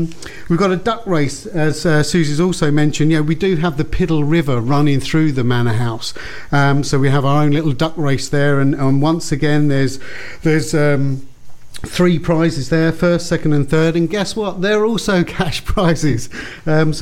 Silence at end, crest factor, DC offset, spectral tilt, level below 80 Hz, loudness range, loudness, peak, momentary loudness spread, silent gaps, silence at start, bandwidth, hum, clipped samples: 0 s; 14 dB; under 0.1%; -6 dB/octave; -34 dBFS; 2 LU; -16 LUFS; -2 dBFS; 6 LU; none; 0 s; 15 kHz; none; under 0.1%